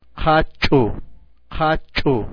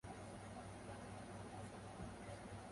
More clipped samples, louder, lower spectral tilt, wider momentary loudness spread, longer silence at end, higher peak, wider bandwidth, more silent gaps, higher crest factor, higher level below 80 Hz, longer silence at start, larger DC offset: neither; first, -19 LUFS vs -53 LUFS; first, -7.5 dB/octave vs -5.5 dB/octave; first, 11 LU vs 1 LU; about the same, 0 s vs 0 s; first, -4 dBFS vs -38 dBFS; second, 5.4 kHz vs 11.5 kHz; neither; about the same, 16 dB vs 14 dB; first, -30 dBFS vs -66 dBFS; about the same, 0.15 s vs 0.05 s; neither